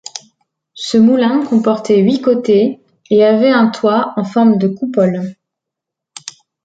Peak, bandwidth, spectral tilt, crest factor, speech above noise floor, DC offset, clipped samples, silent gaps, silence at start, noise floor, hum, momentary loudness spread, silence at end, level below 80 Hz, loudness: -2 dBFS; 9 kHz; -6.5 dB/octave; 12 dB; 69 dB; under 0.1%; under 0.1%; none; 0.15 s; -81 dBFS; none; 20 LU; 0.35 s; -60 dBFS; -13 LUFS